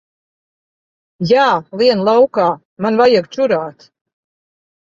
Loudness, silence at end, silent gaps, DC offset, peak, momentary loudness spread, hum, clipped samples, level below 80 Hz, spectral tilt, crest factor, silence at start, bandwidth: -14 LUFS; 1.15 s; 2.65-2.77 s; under 0.1%; -2 dBFS; 8 LU; none; under 0.1%; -60 dBFS; -6 dB/octave; 14 dB; 1.2 s; 7.6 kHz